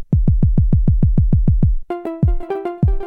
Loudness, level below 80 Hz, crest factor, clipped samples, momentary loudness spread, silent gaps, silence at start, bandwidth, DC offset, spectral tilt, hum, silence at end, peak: -18 LUFS; -18 dBFS; 12 dB; under 0.1%; 8 LU; none; 0 s; 3.3 kHz; under 0.1%; -12 dB/octave; none; 0 s; -4 dBFS